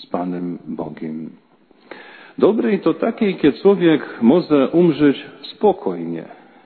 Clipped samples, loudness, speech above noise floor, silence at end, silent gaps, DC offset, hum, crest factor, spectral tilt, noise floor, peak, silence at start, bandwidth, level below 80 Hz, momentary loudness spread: under 0.1%; -17 LUFS; 25 dB; 0.4 s; none; under 0.1%; none; 16 dB; -11 dB/octave; -42 dBFS; -2 dBFS; 0 s; 4.5 kHz; -60 dBFS; 17 LU